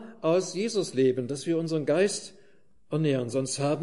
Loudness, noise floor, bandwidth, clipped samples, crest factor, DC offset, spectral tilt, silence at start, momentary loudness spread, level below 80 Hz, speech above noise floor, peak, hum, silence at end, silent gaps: -27 LUFS; -63 dBFS; 11.5 kHz; under 0.1%; 14 dB; 0.2%; -5.5 dB/octave; 0 s; 6 LU; -72 dBFS; 37 dB; -12 dBFS; none; 0 s; none